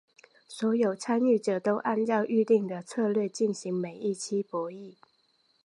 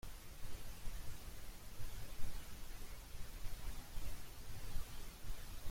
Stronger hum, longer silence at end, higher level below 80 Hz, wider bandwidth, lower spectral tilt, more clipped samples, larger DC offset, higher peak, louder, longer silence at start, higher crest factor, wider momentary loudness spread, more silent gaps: neither; first, 0.75 s vs 0 s; second, -82 dBFS vs -50 dBFS; second, 11.5 kHz vs 16.5 kHz; first, -6 dB/octave vs -3.5 dB/octave; neither; neither; first, -12 dBFS vs -26 dBFS; first, -28 LUFS vs -53 LUFS; first, 0.5 s vs 0.05 s; about the same, 16 dB vs 16 dB; first, 9 LU vs 3 LU; neither